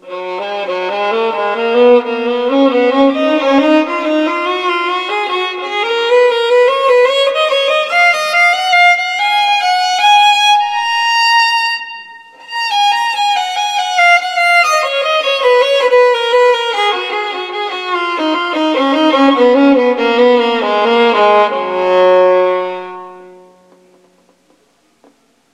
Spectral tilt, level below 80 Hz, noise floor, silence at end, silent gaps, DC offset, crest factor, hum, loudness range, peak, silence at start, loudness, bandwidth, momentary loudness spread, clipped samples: -2 dB/octave; -64 dBFS; -55 dBFS; 2.25 s; none; under 0.1%; 12 dB; none; 4 LU; 0 dBFS; 0.05 s; -11 LUFS; 13.5 kHz; 9 LU; under 0.1%